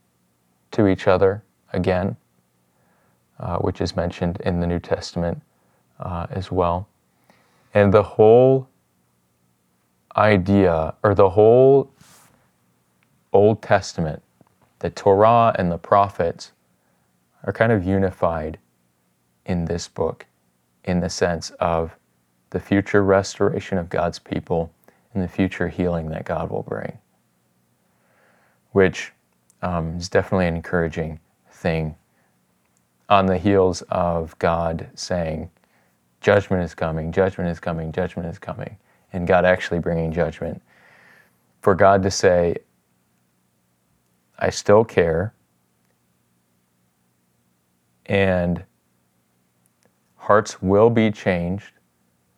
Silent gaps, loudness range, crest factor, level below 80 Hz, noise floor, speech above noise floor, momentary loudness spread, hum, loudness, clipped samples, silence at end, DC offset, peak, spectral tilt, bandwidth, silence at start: none; 9 LU; 20 dB; -50 dBFS; -66 dBFS; 47 dB; 16 LU; none; -20 LUFS; under 0.1%; 0.8 s; under 0.1%; 0 dBFS; -6.5 dB/octave; 11.5 kHz; 0.7 s